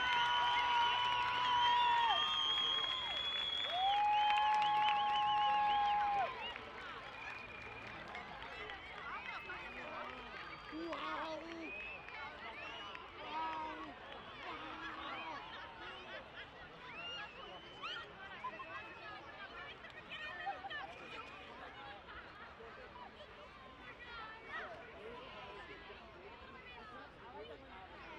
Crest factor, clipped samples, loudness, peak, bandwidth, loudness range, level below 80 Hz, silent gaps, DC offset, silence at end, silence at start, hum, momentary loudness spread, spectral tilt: 20 dB; under 0.1%; -39 LUFS; -20 dBFS; 10 kHz; 17 LU; -68 dBFS; none; under 0.1%; 0 s; 0 s; none; 20 LU; -2.5 dB/octave